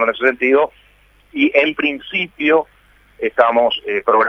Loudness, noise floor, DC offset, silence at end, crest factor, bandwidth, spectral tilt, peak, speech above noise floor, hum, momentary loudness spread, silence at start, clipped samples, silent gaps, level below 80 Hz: -16 LUFS; -51 dBFS; under 0.1%; 0 s; 16 dB; 6.2 kHz; -5.5 dB/octave; 0 dBFS; 36 dB; 50 Hz at -55 dBFS; 9 LU; 0 s; under 0.1%; none; -54 dBFS